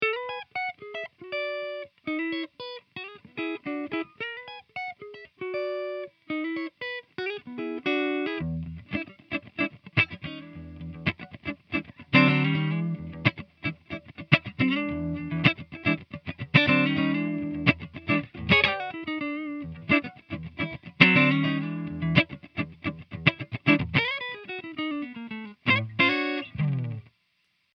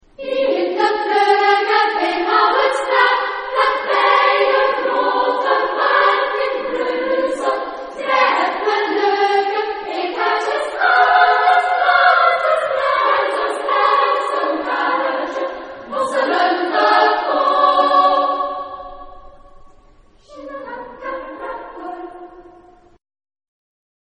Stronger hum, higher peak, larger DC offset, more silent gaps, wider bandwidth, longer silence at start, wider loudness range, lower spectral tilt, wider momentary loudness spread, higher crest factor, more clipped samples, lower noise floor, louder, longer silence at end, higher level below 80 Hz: neither; about the same, 0 dBFS vs 0 dBFS; neither; neither; second, 6.2 kHz vs 10 kHz; second, 0 s vs 0.2 s; second, 10 LU vs 18 LU; first, -7.5 dB/octave vs -2.5 dB/octave; about the same, 16 LU vs 15 LU; first, 28 dB vs 18 dB; neither; first, -72 dBFS vs -48 dBFS; second, -27 LUFS vs -16 LUFS; second, 0.75 s vs 1.8 s; about the same, -56 dBFS vs -54 dBFS